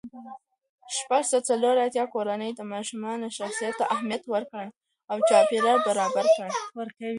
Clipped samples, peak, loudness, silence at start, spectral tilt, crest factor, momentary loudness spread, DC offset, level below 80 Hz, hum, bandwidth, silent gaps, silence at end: under 0.1%; -8 dBFS; -25 LUFS; 0.05 s; -3 dB/octave; 18 dB; 15 LU; under 0.1%; -78 dBFS; none; 11.5 kHz; 0.69-0.78 s, 4.77-4.81 s; 0 s